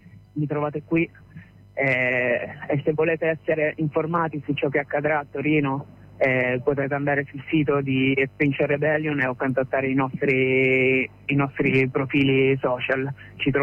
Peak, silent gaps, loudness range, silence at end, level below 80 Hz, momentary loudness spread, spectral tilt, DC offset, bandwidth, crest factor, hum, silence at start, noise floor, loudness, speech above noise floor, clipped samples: -10 dBFS; none; 3 LU; 0 s; -56 dBFS; 7 LU; -8.5 dB/octave; under 0.1%; 5.4 kHz; 14 dB; none; 0.15 s; -46 dBFS; -23 LUFS; 23 dB; under 0.1%